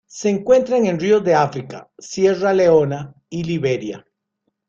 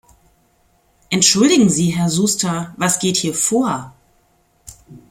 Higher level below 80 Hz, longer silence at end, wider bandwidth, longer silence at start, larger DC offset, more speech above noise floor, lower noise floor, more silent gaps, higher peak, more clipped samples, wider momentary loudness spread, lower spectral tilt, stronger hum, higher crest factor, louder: about the same, -56 dBFS vs -54 dBFS; first, 0.7 s vs 0.15 s; second, 7.6 kHz vs 16.5 kHz; second, 0.15 s vs 1.1 s; neither; first, 56 dB vs 43 dB; first, -73 dBFS vs -59 dBFS; neither; about the same, -2 dBFS vs 0 dBFS; neither; first, 16 LU vs 10 LU; first, -6 dB/octave vs -3.5 dB/octave; neither; about the same, 16 dB vs 18 dB; about the same, -17 LUFS vs -16 LUFS